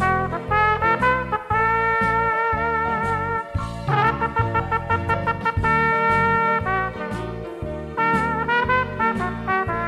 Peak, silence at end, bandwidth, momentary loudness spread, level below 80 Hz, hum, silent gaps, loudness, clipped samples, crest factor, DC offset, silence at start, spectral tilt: -6 dBFS; 0 s; 13.5 kHz; 9 LU; -38 dBFS; none; none; -21 LUFS; under 0.1%; 14 dB; under 0.1%; 0 s; -7 dB/octave